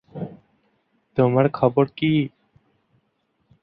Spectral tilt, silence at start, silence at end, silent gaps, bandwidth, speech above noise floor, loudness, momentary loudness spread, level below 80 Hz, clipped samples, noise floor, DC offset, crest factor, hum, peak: -11.5 dB/octave; 0.15 s; 1.35 s; none; 5.2 kHz; 51 dB; -21 LUFS; 17 LU; -60 dBFS; under 0.1%; -70 dBFS; under 0.1%; 22 dB; none; -2 dBFS